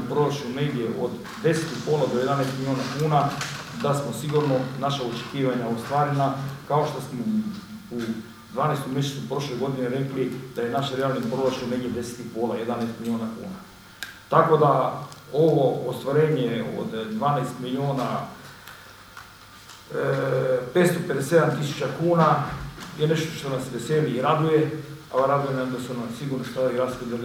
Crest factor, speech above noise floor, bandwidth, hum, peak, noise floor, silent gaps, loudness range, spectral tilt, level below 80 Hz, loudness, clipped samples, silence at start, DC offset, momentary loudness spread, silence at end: 22 dB; 22 dB; 16.5 kHz; none; -2 dBFS; -46 dBFS; none; 5 LU; -6.5 dB/octave; -56 dBFS; -25 LUFS; under 0.1%; 0 s; under 0.1%; 15 LU; 0 s